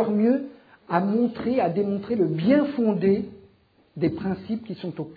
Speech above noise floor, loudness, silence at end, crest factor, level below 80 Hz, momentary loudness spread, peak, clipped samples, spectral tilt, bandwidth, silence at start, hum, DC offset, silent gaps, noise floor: 37 dB; -24 LUFS; 0 s; 18 dB; -60 dBFS; 12 LU; -6 dBFS; under 0.1%; -11 dB/octave; 5 kHz; 0 s; none; under 0.1%; none; -60 dBFS